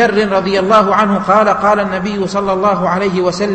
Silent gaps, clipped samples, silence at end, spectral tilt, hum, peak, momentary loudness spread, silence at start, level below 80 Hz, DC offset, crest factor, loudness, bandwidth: none; under 0.1%; 0 s; -6 dB/octave; none; 0 dBFS; 6 LU; 0 s; -44 dBFS; under 0.1%; 12 dB; -13 LUFS; 8.8 kHz